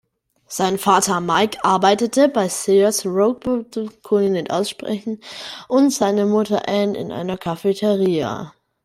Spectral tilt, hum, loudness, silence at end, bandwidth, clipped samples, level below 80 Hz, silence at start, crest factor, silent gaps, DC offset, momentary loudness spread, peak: -4.5 dB/octave; none; -19 LUFS; 0.35 s; 16 kHz; under 0.1%; -60 dBFS; 0.5 s; 18 dB; none; under 0.1%; 12 LU; -2 dBFS